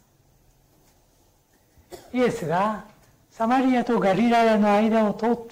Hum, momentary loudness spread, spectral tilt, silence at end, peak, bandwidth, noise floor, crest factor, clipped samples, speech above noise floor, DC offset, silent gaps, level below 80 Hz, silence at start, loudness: none; 9 LU; -6.5 dB/octave; 0 s; -12 dBFS; 16 kHz; -61 dBFS; 10 dB; under 0.1%; 40 dB; under 0.1%; none; -58 dBFS; 1.9 s; -22 LUFS